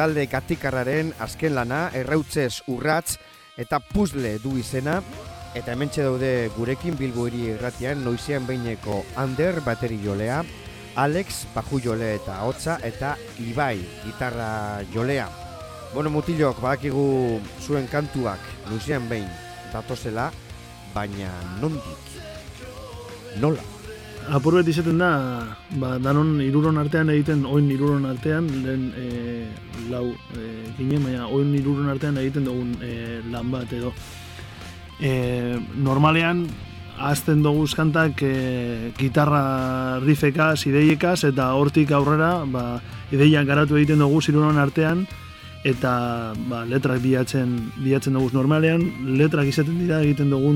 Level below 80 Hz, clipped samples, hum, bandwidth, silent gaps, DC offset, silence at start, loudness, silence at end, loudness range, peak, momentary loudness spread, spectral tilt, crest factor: -46 dBFS; under 0.1%; none; 16.5 kHz; none; under 0.1%; 0 s; -23 LUFS; 0 s; 9 LU; -4 dBFS; 16 LU; -6.5 dB/octave; 18 dB